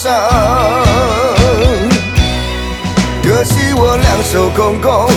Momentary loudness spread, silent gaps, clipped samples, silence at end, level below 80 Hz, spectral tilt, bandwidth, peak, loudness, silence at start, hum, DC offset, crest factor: 4 LU; none; under 0.1%; 0 s; -20 dBFS; -5 dB/octave; 18 kHz; 0 dBFS; -11 LUFS; 0 s; none; under 0.1%; 10 dB